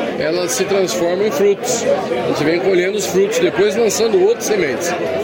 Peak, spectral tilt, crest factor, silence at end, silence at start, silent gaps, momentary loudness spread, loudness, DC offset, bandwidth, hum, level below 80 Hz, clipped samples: -4 dBFS; -3.5 dB/octave; 12 dB; 0 s; 0 s; none; 4 LU; -16 LUFS; under 0.1%; 17 kHz; none; -56 dBFS; under 0.1%